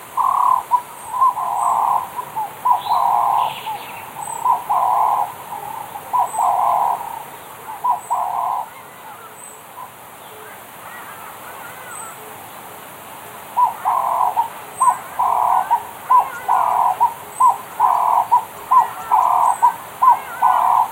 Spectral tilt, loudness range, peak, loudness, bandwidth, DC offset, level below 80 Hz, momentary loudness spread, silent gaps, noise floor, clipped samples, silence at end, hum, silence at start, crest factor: -2 dB/octave; 17 LU; -2 dBFS; -18 LUFS; 16 kHz; under 0.1%; -64 dBFS; 19 LU; none; -38 dBFS; under 0.1%; 0 s; none; 0 s; 16 dB